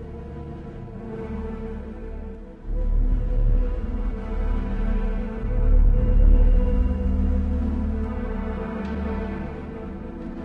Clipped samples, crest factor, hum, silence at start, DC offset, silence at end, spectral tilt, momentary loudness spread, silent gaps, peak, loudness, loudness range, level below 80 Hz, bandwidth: under 0.1%; 16 dB; none; 0 s; under 0.1%; 0 s; -10 dB/octave; 15 LU; none; -6 dBFS; -27 LUFS; 6 LU; -22 dBFS; 3.2 kHz